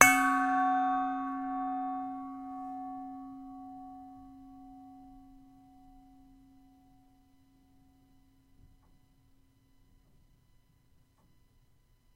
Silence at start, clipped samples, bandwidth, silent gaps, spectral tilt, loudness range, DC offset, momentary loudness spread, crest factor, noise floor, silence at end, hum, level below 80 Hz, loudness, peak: 0 s; under 0.1%; 16 kHz; none; -2 dB/octave; 25 LU; under 0.1%; 25 LU; 36 dB; -66 dBFS; 6.95 s; none; -64 dBFS; -32 LUFS; 0 dBFS